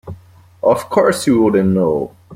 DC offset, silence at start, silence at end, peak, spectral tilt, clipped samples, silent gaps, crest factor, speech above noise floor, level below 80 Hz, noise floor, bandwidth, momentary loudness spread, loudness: under 0.1%; 0.05 s; 0 s; -2 dBFS; -6.5 dB/octave; under 0.1%; none; 14 dB; 28 dB; -50 dBFS; -42 dBFS; 16 kHz; 7 LU; -15 LUFS